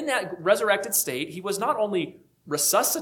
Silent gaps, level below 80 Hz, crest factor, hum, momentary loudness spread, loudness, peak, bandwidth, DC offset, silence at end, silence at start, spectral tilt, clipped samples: none; -72 dBFS; 18 dB; none; 9 LU; -24 LUFS; -6 dBFS; 19 kHz; under 0.1%; 0 s; 0 s; -2 dB/octave; under 0.1%